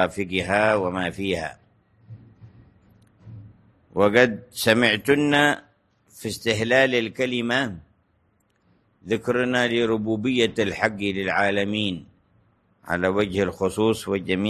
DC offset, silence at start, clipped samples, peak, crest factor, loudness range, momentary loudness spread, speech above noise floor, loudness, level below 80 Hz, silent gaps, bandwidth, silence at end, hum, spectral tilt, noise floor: under 0.1%; 0 s; under 0.1%; -2 dBFS; 22 dB; 5 LU; 10 LU; 44 dB; -22 LUFS; -52 dBFS; none; 13 kHz; 0 s; none; -5 dB/octave; -66 dBFS